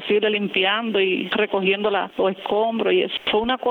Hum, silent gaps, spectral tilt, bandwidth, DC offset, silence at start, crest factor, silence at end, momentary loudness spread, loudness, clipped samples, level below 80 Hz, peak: none; none; -7 dB/octave; 4.4 kHz; under 0.1%; 0 s; 14 dB; 0 s; 3 LU; -21 LUFS; under 0.1%; -56 dBFS; -8 dBFS